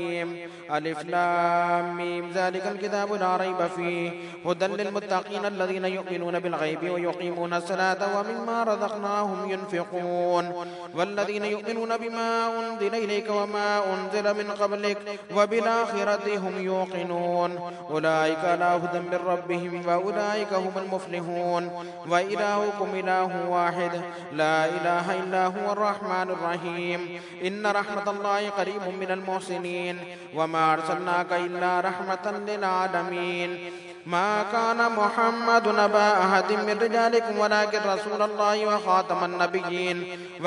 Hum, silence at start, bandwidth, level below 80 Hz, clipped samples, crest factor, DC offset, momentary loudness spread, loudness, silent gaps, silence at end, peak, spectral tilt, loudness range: none; 0 s; 11 kHz; -80 dBFS; under 0.1%; 20 dB; under 0.1%; 8 LU; -26 LUFS; none; 0 s; -6 dBFS; -5 dB/octave; 5 LU